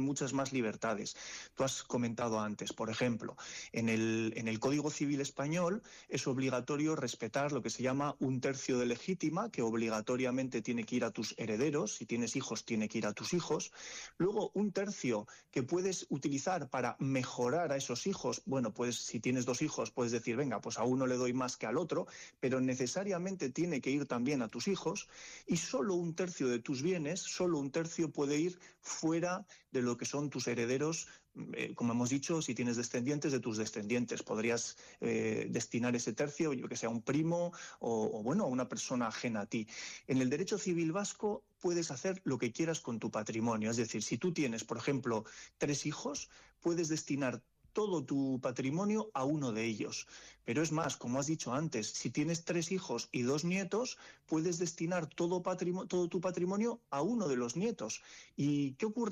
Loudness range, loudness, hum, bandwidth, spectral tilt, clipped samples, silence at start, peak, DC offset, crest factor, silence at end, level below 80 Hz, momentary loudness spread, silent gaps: 1 LU; -36 LUFS; none; 15 kHz; -5 dB/octave; under 0.1%; 0 s; -24 dBFS; under 0.1%; 12 dB; 0 s; -74 dBFS; 6 LU; none